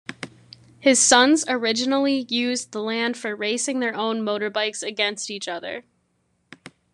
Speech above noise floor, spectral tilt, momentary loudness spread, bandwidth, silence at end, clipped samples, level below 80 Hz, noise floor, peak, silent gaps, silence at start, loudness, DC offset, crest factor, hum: 47 dB; -1.5 dB/octave; 15 LU; 12 kHz; 1.15 s; under 0.1%; -70 dBFS; -69 dBFS; -2 dBFS; none; 0.1 s; -21 LUFS; under 0.1%; 22 dB; none